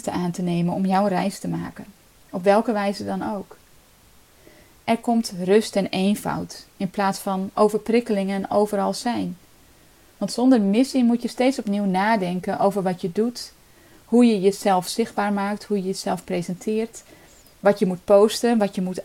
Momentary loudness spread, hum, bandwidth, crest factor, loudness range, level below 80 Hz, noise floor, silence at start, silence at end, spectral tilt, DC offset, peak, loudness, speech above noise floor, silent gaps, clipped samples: 12 LU; none; 16.5 kHz; 18 dB; 4 LU; -58 dBFS; -53 dBFS; 0.05 s; 0 s; -6 dB/octave; under 0.1%; -4 dBFS; -22 LUFS; 32 dB; none; under 0.1%